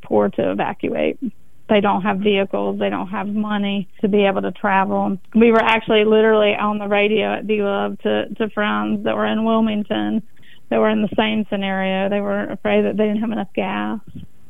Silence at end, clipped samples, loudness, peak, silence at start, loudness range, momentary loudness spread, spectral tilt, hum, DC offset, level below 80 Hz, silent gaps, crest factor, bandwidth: 0.25 s; under 0.1%; -19 LUFS; -2 dBFS; 0.05 s; 4 LU; 8 LU; -8 dB/octave; none; 2%; -54 dBFS; none; 16 dB; 3.9 kHz